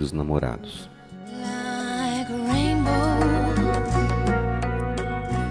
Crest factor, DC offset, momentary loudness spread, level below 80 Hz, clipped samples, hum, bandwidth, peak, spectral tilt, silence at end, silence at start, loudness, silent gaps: 16 dB; under 0.1%; 14 LU; -32 dBFS; under 0.1%; none; 11 kHz; -8 dBFS; -6.5 dB/octave; 0 s; 0 s; -24 LUFS; none